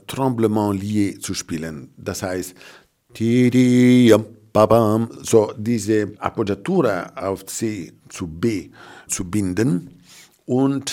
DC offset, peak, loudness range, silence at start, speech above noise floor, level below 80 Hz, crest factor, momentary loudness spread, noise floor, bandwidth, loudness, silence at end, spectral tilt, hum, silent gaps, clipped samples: under 0.1%; -2 dBFS; 8 LU; 0.1 s; 29 dB; -54 dBFS; 18 dB; 15 LU; -48 dBFS; 16.5 kHz; -19 LUFS; 0 s; -6 dB/octave; none; none; under 0.1%